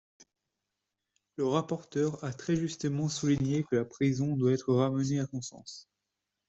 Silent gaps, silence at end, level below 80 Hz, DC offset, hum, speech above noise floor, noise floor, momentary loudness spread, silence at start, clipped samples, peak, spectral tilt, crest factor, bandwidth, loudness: none; 0.65 s; -64 dBFS; under 0.1%; none; 56 dB; -86 dBFS; 13 LU; 1.4 s; under 0.1%; -14 dBFS; -6.5 dB/octave; 18 dB; 8.2 kHz; -31 LUFS